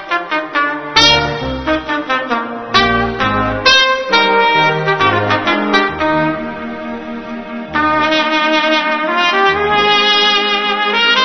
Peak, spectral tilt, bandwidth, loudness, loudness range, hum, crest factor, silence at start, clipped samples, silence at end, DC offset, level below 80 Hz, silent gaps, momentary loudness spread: 0 dBFS; -3.5 dB/octave; 11 kHz; -12 LUFS; 4 LU; none; 14 dB; 0 s; under 0.1%; 0 s; 0.5%; -38 dBFS; none; 11 LU